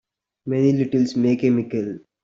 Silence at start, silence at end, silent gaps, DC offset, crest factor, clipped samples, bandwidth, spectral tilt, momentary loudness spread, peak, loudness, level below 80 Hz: 0.45 s; 0.25 s; none; under 0.1%; 14 dB; under 0.1%; 7.6 kHz; -8 dB/octave; 10 LU; -8 dBFS; -20 LUFS; -62 dBFS